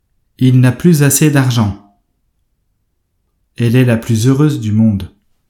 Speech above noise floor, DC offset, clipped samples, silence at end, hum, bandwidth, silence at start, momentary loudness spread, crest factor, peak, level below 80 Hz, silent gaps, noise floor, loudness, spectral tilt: 54 dB; under 0.1%; under 0.1%; 0.4 s; none; 18.5 kHz; 0.4 s; 9 LU; 14 dB; 0 dBFS; -46 dBFS; none; -64 dBFS; -12 LUFS; -6 dB/octave